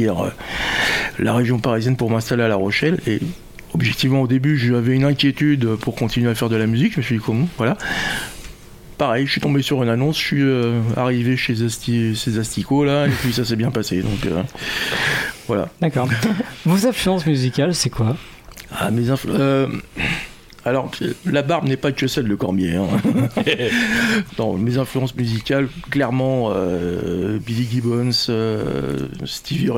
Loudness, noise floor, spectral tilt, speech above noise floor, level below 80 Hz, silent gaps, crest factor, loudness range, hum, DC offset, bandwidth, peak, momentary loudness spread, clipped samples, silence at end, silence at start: -19 LUFS; -39 dBFS; -5.5 dB/octave; 20 dB; -42 dBFS; none; 14 dB; 3 LU; none; under 0.1%; 17 kHz; -4 dBFS; 6 LU; under 0.1%; 0 s; 0 s